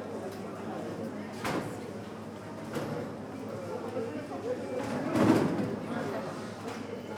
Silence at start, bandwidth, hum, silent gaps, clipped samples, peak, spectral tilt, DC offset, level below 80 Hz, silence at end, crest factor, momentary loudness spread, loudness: 0 s; 19 kHz; none; none; under 0.1%; -12 dBFS; -6.5 dB/octave; under 0.1%; -68 dBFS; 0 s; 22 dB; 13 LU; -34 LUFS